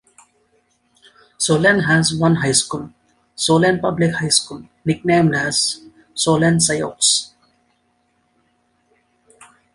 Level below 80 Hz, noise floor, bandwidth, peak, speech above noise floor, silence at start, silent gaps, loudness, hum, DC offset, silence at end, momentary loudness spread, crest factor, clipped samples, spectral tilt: -52 dBFS; -64 dBFS; 11.5 kHz; 0 dBFS; 47 dB; 1.4 s; none; -16 LUFS; none; under 0.1%; 2.5 s; 12 LU; 20 dB; under 0.1%; -3.5 dB/octave